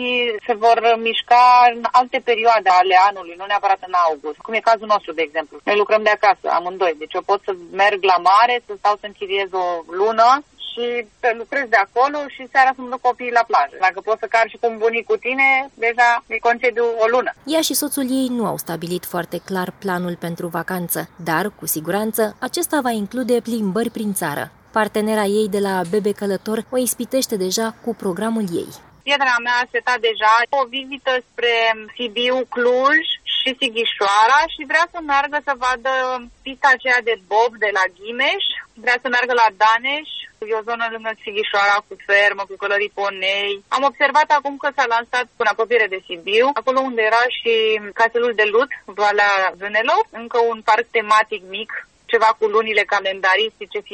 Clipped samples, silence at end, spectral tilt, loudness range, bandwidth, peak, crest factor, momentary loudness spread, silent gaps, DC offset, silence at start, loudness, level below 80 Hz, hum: under 0.1%; 0.05 s; -3 dB/octave; 4 LU; 19.5 kHz; 0 dBFS; 18 dB; 10 LU; none; under 0.1%; 0 s; -18 LUFS; -60 dBFS; none